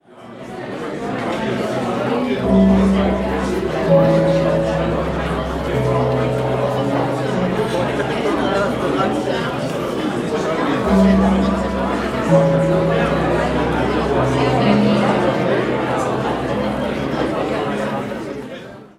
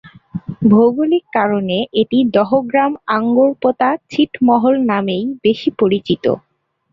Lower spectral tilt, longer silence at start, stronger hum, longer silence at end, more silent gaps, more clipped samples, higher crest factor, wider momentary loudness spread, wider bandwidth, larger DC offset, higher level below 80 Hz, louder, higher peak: about the same, -7 dB/octave vs -8 dB/octave; about the same, 0.15 s vs 0.05 s; neither; second, 0.1 s vs 0.55 s; neither; neither; about the same, 16 dB vs 14 dB; about the same, 8 LU vs 6 LU; first, 13 kHz vs 7 kHz; neither; first, -34 dBFS vs -54 dBFS; second, -18 LUFS vs -15 LUFS; about the same, -2 dBFS vs -2 dBFS